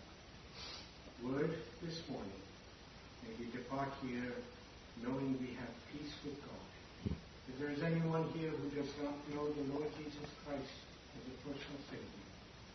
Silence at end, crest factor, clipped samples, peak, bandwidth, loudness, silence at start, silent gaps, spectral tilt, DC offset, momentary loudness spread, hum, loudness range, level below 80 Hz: 0 s; 20 dB; under 0.1%; -26 dBFS; 6.2 kHz; -44 LUFS; 0 s; none; -5.5 dB/octave; under 0.1%; 15 LU; none; 5 LU; -64 dBFS